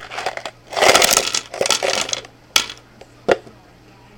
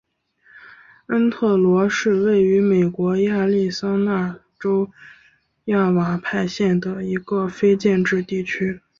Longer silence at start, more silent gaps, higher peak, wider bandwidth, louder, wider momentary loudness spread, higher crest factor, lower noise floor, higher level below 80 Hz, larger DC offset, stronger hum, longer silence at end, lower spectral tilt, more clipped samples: second, 0 s vs 0.55 s; neither; first, 0 dBFS vs -6 dBFS; first, over 20 kHz vs 7.4 kHz; first, -17 LUFS vs -20 LUFS; first, 15 LU vs 8 LU; first, 20 dB vs 14 dB; second, -46 dBFS vs -57 dBFS; first, -50 dBFS vs -58 dBFS; neither; neither; first, 0.7 s vs 0.2 s; second, -0.5 dB/octave vs -7 dB/octave; neither